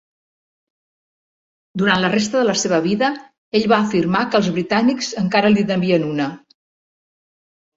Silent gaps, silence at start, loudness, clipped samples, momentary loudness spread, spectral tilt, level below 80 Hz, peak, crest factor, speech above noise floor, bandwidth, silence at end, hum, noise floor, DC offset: 3.38-3.52 s; 1.75 s; -18 LUFS; under 0.1%; 6 LU; -5 dB/octave; -56 dBFS; -2 dBFS; 18 dB; over 73 dB; 8 kHz; 1.4 s; none; under -90 dBFS; under 0.1%